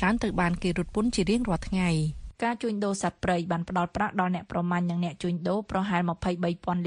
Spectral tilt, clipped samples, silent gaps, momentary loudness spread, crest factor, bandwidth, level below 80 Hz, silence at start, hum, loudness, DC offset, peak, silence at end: -6 dB/octave; under 0.1%; none; 4 LU; 18 dB; 10.5 kHz; -44 dBFS; 0 s; none; -28 LUFS; under 0.1%; -10 dBFS; 0 s